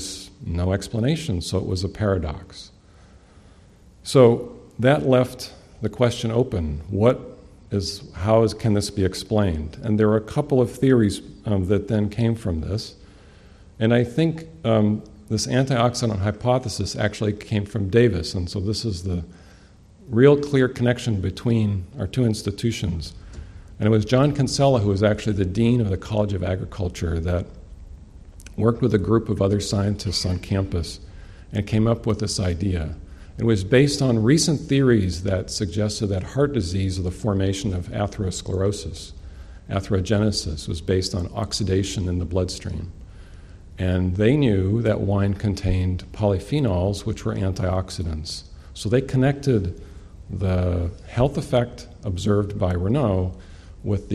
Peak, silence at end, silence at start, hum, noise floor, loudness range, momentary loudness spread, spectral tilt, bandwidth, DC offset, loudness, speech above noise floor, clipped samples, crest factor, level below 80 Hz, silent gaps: -2 dBFS; 0 s; 0 s; none; -50 dBFS; 4 LU; 12 LU; -6.5 dB/octave; 13 kHz; under 0.1%; -22 LUFS; 28 dB; under 0.1%; 20 dB; -40 dBFS; none